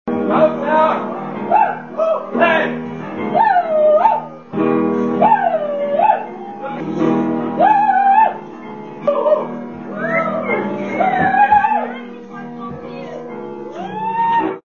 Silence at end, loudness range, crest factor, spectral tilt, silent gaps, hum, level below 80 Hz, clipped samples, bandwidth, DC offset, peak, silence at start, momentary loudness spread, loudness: 0.05 s; 3 LU; 16 dB; -7.5 dB/octave; none; none; -58 dBFS; under 0.1%; 6.8 kHz; 0.4%; 0 dBFS; 0.05 s; 17 LU; -16 LUFS